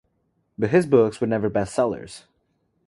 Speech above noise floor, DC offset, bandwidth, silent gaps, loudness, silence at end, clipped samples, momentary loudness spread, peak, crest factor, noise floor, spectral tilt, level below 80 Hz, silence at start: 49 dB; under 0.1%; 11.5 kHz; none; -21 LUFS; 0.7 s; under 0.1%; 12 LU; -4 dBFS; 20 dB; -70 dBFS; -7 dB/octave; -56 dBFS; 0.6 s